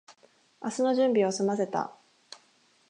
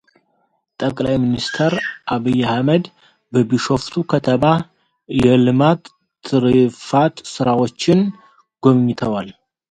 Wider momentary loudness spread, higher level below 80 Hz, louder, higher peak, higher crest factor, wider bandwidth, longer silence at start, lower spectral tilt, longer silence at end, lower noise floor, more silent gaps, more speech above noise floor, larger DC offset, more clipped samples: first, 25 LU vs 9 LU; second, -84 dBFS vs -48 dBFS; second, -28 LUFS vs -17 LUFS; second, -14 dBFS vs 0 dBFS; about the same, 16 dB vs 16 dB; first, 11 kHz vs 9.2 kHz; second, 0.1 s vs 0.8 s; second, -5 dB/octave vs -6.5 dB/octave; first, 1 s vs 0.4 s; about the same, -65 dBFS vs -65 dBFS; neither; second, 38 dB vs 49 dB; neither; neither